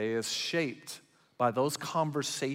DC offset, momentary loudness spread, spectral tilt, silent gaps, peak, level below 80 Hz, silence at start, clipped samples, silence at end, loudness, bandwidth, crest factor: under 0.1%; 15 LU; -4 dB/octave; none; -16 dBFS; -80 dBFS; 0 s; under 0.1%; 0 s; -32 LUFS; 16 kHz; 18 dB